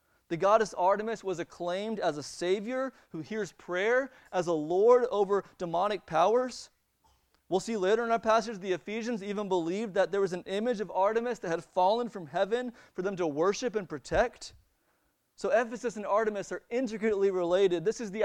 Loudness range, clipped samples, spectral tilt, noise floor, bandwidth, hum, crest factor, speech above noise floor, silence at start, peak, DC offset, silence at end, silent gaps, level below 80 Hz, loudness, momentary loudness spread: 4 LU; under 0.1%; -5 dB/octave; -74 dBFS; 11 kHz; none; 20 dB; 44 dB; 0.3 s; -10 dBFS; under 0.1%; 0 s; none; -60 dBFS; -30 LUFS; 10 LU